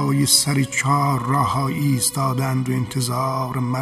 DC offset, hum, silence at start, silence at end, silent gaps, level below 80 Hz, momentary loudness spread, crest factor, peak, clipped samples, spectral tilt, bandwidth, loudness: under 0.1%; none; 0 s; 0 s; none; -52 dBFS; 8 LU; 18 dB; -2 dBFS; under 0.1%; -4 dB/octave; 15 kHz; -19 LUFS